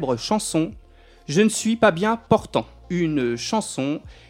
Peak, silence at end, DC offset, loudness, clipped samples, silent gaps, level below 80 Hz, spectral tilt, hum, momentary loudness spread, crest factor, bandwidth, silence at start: -2 dBFS; 0.15 s; under 0.1%; -22 LUFS; under 0.1%; none; -50 dBFS; -4.5 dB/octave; none; 9 LU; 20 dB; 16 kHz; 0 s